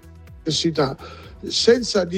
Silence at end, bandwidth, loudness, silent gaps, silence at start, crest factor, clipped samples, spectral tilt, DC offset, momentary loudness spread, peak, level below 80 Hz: 0 s; 10.5 kHz; -20 LUFS; none; 0.05 s; 20 dB; under 0.1%; -4 dB/octave; under 0.1%; 19 LU; -2 dBFS; -46 dBFS